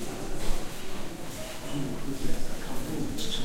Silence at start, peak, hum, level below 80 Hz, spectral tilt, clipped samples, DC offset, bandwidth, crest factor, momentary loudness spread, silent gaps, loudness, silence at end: 0 s; -12 dBFS; none; -34 dBFS; -4 dB/octave; under 0.1%; under 0.1%; 15.5 kHz; 16 dB; 5 LU; none; -36 LUFS; 0 s